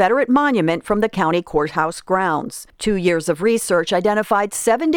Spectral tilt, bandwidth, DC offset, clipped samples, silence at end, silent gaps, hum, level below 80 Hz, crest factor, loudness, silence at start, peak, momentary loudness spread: -4.5 dB/octave; 18.5 kHz; under 0.1%; under 0.1%; 0 s; none; none; -46 dBFS; 16 dB; -18 LUFS; 0 s; -2 dBFS; 6 LU